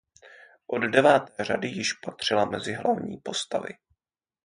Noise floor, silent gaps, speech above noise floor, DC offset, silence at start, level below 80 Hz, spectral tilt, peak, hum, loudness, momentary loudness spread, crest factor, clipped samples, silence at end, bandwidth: under -90 dBFS; none; over 64 dB; under 0.1%; 0.25 s; -66 dBFS; -3.5 dB/octave; -4 dBFS; none; -26 LUFS; 11 LU; 24 dB; under 0.1%; 0.7 s; 10.5 kHz